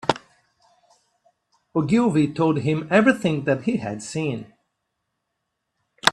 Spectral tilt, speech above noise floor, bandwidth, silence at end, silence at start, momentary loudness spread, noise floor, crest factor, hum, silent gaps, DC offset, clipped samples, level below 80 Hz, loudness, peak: -5.5 dB/octave; 58 dB; 13.5 kHz; 0 s; 0.05 s; 11 LU; -78 dBFS; 24 dB; none; none; under 0.1%; under 0.1%; -60 dBFS; -22 LUFS; 0 dBFS